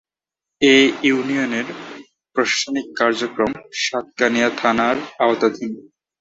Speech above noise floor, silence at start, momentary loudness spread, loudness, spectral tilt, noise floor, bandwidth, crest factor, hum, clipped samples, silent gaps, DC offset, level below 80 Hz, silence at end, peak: 68 dB; 0.6 s; 15 LU; -18 LUFS; -3 dB/octave; -87 dBFS; 8 kHz; 18 dB; none; under 0.1%; none; under 0.1%; -60 dBFS; 0.35 s; -2 dBFS